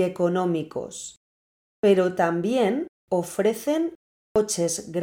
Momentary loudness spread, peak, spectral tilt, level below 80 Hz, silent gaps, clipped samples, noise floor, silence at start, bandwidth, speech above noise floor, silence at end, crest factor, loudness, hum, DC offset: 12 LU; -6 dBFS; -5 dB/octave; -62 dBFS; 1.17-1.83 s, 2.89-3.08 s, 3.95-4.35 s; under 0.1%; under -90 dBFS; 0 s; 19.5 kHz; over 67 dB; 0 s; 18 dB; -24 LUFS; none; under 0.1%